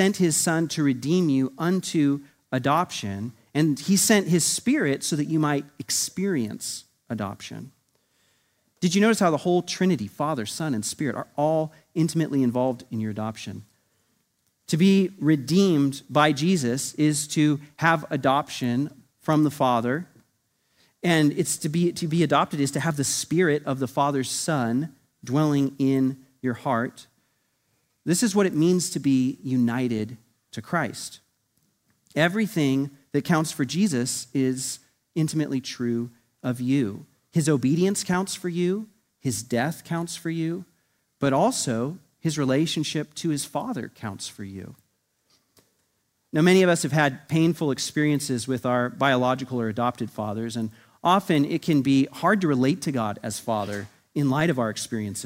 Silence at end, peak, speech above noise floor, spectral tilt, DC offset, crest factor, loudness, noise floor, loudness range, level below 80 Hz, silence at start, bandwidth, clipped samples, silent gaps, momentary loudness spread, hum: 0 s; -4 dBFS; 49 dB; -5 dB/octave; under 0.1%; 20 dB; -24 LUFS; -72 dBFS; 5 LU; -66 dBFS; 0 s; 16 kHz; under 0.1%; none; 11 LU; none